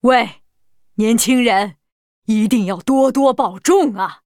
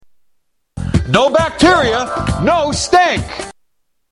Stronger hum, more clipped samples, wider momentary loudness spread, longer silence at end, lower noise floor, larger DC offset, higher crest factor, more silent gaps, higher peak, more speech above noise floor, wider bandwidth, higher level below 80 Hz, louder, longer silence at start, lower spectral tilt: neither; neither; second, 10 LU vs 15 LU; second, 0.1 s vs 0.6 s; second, -59 dBFS vs -67 dBFS; neither; about the same, 16 dB vs 14 dB; first, 1.92-2.22 s vs none; about the same, 0 dBFS vs 0 dBFS; second, 44 dB vs 54 dB; first, 18.5 kHz vs 11.5 kHz; second, -54 dBFS vs -32 dBFS; second, -16 LUFS vs -13 LUFS; second, 0.05 s vs 0.75 s; about the same, -4 dB/octave vs -4.5 dB/octave